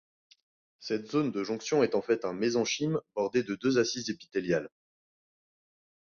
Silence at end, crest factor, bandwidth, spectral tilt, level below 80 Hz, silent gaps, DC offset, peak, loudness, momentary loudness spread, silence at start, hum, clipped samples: 1.45 s; 18 dB; 7.2 kHz; -4.5 dB/octave; -70 dBFS; none; under 0.1%; -14 dBFS; -30 LUFS; 8 LU; 0.8 s; none; under 0.1%